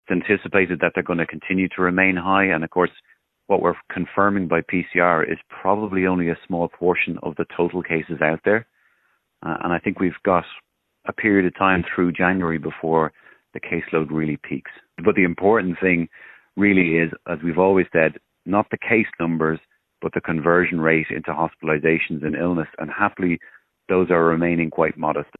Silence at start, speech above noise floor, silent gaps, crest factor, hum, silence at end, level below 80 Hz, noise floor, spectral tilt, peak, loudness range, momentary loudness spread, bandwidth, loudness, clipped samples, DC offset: 0.1 s; 46 dB; none; 20 dB; none; 0.15 s; -50 dBFS; -66 dBFS; -10.5 dB/octave; -2 dBFS; 3 LU; 9 LU; 4 kHz; -21 LUFS; under 0.1%; under 0.1%